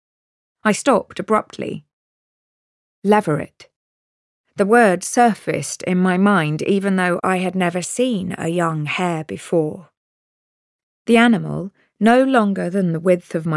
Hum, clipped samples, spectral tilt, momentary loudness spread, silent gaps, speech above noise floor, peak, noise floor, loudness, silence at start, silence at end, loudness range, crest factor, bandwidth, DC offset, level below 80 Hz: none; under 0.1%; -5.5 dB/octave; 13 LU; 1.93-3.02 s, 3.76-4.44 s, 9.97-11.05 s; over 72 dB; -4 dBFS; under -90 dBFS; -18 LUFS; 0.65 s; 0 s; 6 LU; 16 dB; 12 kHz; under 0.1%; -62 dBFS